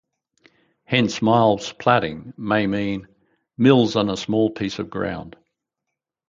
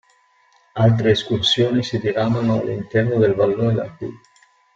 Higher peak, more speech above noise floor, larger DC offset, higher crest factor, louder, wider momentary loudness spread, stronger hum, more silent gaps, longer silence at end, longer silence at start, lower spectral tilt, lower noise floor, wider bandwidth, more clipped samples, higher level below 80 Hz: about the same, -2 dBFS vs -4 dBFS; first, 63 dB vs 40 dB; neither; about the same, 20 dB vs 16 dB; about the same, -20 LUFS vs -18 LUFS; about the same, 12 LU vs 10 LU; neither; neither; first, 1 s vs 0.6 s; first, 0.9 s vs 0.75 s; about the same, -6 dB/octave vs -6.5 dB/octave; first, -82 dBFS vs -58 dBFS; about the same, 7.6 kHz vs 7.8 kHz; neither; about the same, -54 dBFS vs -52 dBFS